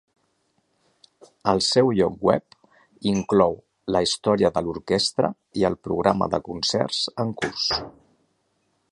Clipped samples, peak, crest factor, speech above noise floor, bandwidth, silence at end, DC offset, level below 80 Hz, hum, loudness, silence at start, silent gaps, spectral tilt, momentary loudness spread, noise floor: under 0.1%; -2 dBFS; 22 dB; 48 dB; 11.5 kHz; 1 s; under 0.1%; -52 dBFS; none; -23 LUFS; 1.45 s; none; -4.5 dB/octave; 7 LU; -70 dBFS